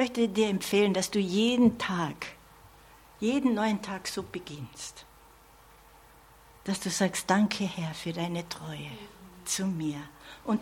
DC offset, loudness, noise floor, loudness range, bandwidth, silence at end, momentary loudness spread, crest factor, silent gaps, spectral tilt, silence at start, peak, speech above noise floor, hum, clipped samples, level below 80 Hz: under 0.1%; -29 LUFS; -56 dBFS; 8 LU; 16.5 kHz; 0 s; 17 LU; 22 dB; none; -4.5 dB/octave; 0 s; -10 dBFS; 27 dB; none; under 0.1%; -60 dBFS